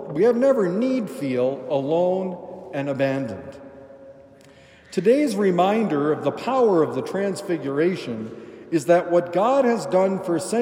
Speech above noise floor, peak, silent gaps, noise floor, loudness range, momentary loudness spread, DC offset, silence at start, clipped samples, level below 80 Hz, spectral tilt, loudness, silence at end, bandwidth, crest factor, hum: 28 dB; -4 dBFS; none; -49 dBFS; 5 LU; 13 LU; under 0.1%; 0 s; under 0.1%; -68 dBFS; -6.5 dB/octave; -22 LUFS; 0 s; 16 kHz; 18 dB; none